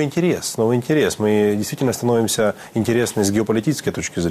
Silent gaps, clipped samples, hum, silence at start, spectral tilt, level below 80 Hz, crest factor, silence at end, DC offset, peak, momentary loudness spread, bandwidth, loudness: none; under 0.1%; none; 0 s; -5 dB/octave; -52 dBFS; 14 dB; 0 s; under 0.1%; -6 dBFS; 4 LU; 15 kHz; -19 LUFS